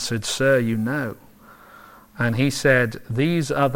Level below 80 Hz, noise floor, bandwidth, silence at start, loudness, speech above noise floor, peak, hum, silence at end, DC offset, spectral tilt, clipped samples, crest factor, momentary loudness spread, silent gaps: -50 dBFS; -47 dBFS; 17 kHz; 0 s; -21 LUFS; 27 dB; -4 dBFS; none; 0 s; under 0.1%; -5 dB/octave; under 0.1%; 18 dB; 8 LU; none